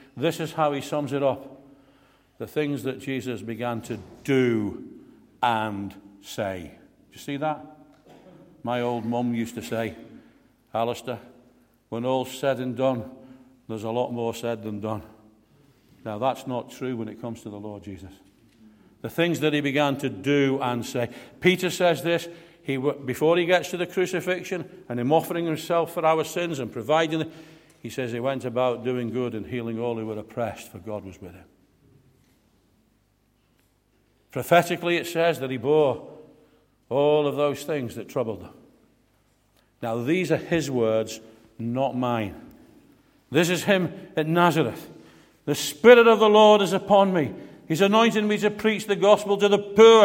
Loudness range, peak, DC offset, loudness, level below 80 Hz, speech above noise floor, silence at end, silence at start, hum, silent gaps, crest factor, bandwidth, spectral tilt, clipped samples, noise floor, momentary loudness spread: 13 LU; -2 dBFS; under 0.1%; -24 LUFS; -64 dBFS; 42 dB; 0 s; 0.15 s; none; none; 24 dB; 16.5 kHz; -5.5 dB/octave; under 0.1%; -66 dBFS; 17 LU